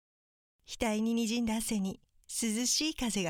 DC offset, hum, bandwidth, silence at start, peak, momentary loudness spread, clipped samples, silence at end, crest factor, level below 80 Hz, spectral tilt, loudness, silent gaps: under 0.1%; none; 18 kHz; 0.7 s; -16 dBFS; 10 LU; under 0.1%; 0 s; 16 dB; -56 dBFS; -3 dB/octave; -32 LUFS; none